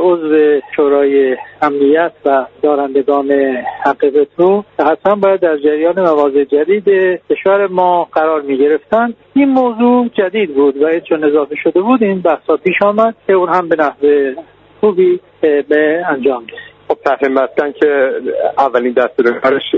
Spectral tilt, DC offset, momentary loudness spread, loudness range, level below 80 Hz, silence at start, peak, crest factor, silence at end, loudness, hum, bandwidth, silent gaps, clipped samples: -8 dB/octave; under 0.1%; 4 LU; 2 LU; -56 dBFS; 0 s; 0 dBFS; 12 dB; 0 s; -12 LUFS; none; 5.2 kHz; none; under 0.1%